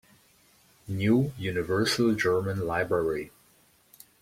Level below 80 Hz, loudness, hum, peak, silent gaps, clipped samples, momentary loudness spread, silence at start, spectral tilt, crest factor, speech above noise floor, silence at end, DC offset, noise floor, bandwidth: -58 dBFS; -27 LUFS; none; -12 dBFS; none; under 0.1%; 9 LU; 0.85 s; -5.5 dB/octave; 16 dB; 36 dB; 0.95 s; under 0.1%; -62 dBFS; 16.5 kHz